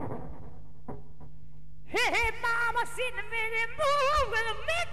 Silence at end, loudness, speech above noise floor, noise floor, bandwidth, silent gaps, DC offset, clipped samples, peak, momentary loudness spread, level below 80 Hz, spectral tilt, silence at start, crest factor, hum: 0 s; -29 LUFS; 22 dB; -52 dBFS; 15.5 kHz; none; 2%; under 0.1%; -16 dBFS; 21 LU; -48 dBFS; -3 dB/octave; 0 s; 14 dB; none